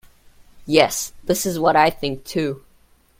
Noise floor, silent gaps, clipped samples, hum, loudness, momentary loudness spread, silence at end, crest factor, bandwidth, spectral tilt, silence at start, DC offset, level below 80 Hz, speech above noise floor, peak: -55 dBFS; none; under 0.1%; none; -20 LUFS; 11 LU; 0.6 s; 22 dB; 16.5 kHz; -3.5 dB/octave; 0.55 s; under 0.1%; -48 dBFS; 36 dB; 0 dBFS